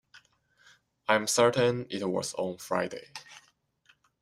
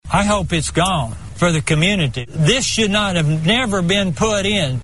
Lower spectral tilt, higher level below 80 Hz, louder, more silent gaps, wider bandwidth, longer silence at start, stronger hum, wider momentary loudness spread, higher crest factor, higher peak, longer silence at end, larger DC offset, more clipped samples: about the same, -3.5 dB/octave vs -4.5 dB/octave; second, -70 dBFS vs -34 dBFS; second, -28 LUFS vs -17 LUFS; neither; first, 15.5 kHz vs 11.5 kHz; first, 0.15 s vs 0 s; neither; first, 18 LU vs 4 LU; first, 24 dB vs 16 dB; second, -8 dBFS vs -2 dBFS; first, 0.8 s vs 0 s; second, under 0.1% vs 1%; neither